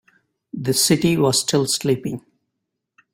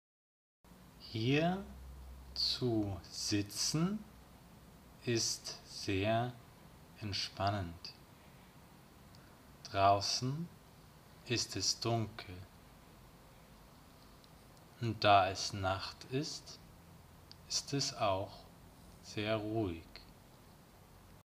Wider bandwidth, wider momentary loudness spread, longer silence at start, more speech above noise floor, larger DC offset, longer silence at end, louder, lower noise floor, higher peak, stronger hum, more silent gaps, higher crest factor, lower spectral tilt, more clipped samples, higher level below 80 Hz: about the same, 16.5 kHz vs 15.5 kHz; second, 15 LU vs 22 LU; second, 0.55 s vs 0.7 s; first, 60 dB vs 24 dB; neither; first, 0.95 s vs 0.05 s; first, -18 LUFS vs -36 LUFS; first, -79 dBFS vs -60 dBFS; first, -4 dBFS vs -14 dBFS; neither; neither; second, 18 dB vs 26 dB; about the same, -4 dB/octave vs -4 dB/octave; neither; first, -56 dBFS vs -62 dBFS